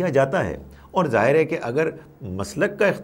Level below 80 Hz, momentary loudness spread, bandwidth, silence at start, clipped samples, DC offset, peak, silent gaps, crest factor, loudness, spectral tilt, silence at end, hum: -50 dBFS; 14 LU; 16.5 kHz; 0 s; under 0.1%; under 0.1%; -4 dBFS; none; 18 dB; -22 LUFS; -6.5 dB/octave; 0 s; none